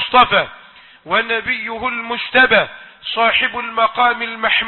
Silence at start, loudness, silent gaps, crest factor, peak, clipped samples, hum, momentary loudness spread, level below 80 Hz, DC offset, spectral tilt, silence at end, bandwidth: 0 s; -15 LUFS; none; 16 dB; 0 dBFS; under 0.1%; none; 10 LU; -50 dBFS; under 0.1%; -6 dB/octave; 0 s; 4.4 kHz